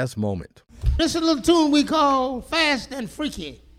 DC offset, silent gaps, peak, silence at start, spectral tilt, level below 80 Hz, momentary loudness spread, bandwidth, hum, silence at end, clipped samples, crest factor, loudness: under 0.1%; none; -4 dBFS; 0 s; -4.5 dB/octave; -34 dBFS; 11 LU; 15 kHz; none; 0.25 s; under 0.1%; 16 dB; -21 LUFS